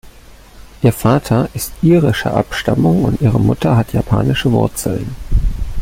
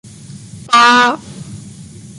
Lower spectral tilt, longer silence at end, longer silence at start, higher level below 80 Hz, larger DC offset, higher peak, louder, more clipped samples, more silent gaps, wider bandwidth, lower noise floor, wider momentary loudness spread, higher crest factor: first, -6.5 dB/octave vs -2.5 dB/octave; about the same, 0 s vs 0.05 s; second, 0.05 s vs 0.3 s; first, -26 dBFS vs -52 dBFS; neither; about the same, -2 dBFS vs 0 dBFS; second, -15 LUFS vs -10 LUFS; neither; neither; first, 16.5 kHz vs 11.5 kHz; first, -39 dBFS vs -34 dBFS; second, 8 LU vs 25 LU; about the same, 14 dB vs 14 dB